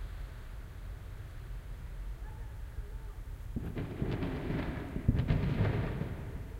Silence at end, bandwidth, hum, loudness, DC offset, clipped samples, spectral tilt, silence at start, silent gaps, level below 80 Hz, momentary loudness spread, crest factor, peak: 0 s; 16 kHz; none; -38 LUFS; under 0.1%; under 0.1%; -8 dB/octave; 0 s; none; -42 dBFS; 15 LU; 22 dB; -14 dBFS